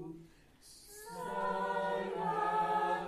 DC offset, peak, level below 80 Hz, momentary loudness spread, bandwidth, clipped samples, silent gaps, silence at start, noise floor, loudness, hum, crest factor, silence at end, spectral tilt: under 0.1%; -22 dBFS; -66 dBFS; 21 LU; 15 kHz; under 0.1%; none; 0 s; -60 dBFS; -35 LUFS; none; 14 dB; 0 s; -5 dB/octave